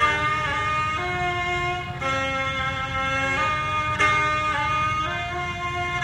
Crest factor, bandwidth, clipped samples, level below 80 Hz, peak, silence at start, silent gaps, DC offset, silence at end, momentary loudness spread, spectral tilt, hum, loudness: 16 dB; 15.5 kHz; under 0.1%; -42 dBFS; -8 dBFS; 0 s; none; under 0.1%; 0 s; 6 LU; -4 dB/octave; none; -23 LUFS